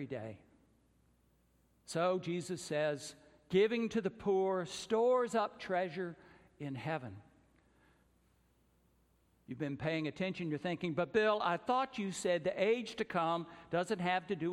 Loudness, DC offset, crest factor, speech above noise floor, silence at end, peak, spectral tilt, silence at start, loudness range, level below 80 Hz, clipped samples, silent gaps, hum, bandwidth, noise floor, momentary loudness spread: -36 LUFS; under 0.1%; 18 dB; 37 dB; 0 s; -18 dBFS; -5.5 dB/octave; 0 s; 11 LU; -72 dBFS; under 0.1%; none; none; 13.5 kHz; -72 dBFS; 12 LU